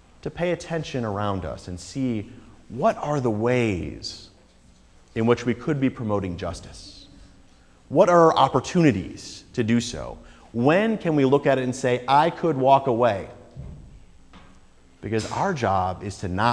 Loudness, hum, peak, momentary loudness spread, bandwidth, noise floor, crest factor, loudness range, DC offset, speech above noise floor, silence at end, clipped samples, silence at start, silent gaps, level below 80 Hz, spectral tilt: -23 LUFS; none; -2 dBFS; 20 LU; 11 kHz; -54 dBFS; 20 dB; 7 LU; under 0.1%; 31 dB; 0 s; under 0.1%; 0.25 s; none; -50 dBFS; -6 dB/octave